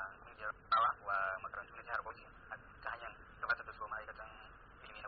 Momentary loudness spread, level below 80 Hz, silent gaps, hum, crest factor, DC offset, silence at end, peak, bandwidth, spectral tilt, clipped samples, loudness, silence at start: 20 LU; -64 dBFS; none; none; 18 dB; under 0.1%; 0 s; -24 dBFS; 4.9 kHz; 0 dB/octave; under 0.1%; -40 LUFS; 0 s